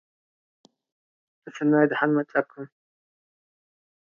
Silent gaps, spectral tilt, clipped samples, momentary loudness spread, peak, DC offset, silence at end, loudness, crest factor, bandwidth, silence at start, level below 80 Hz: none; -7.5 dB/octave; under 0.1%; 22 LU; -8 dBFS; under 0.1%; 1.5 s; -23 LUFS; 22 dB; 7 kHz; 1.45 s; -82 dBFS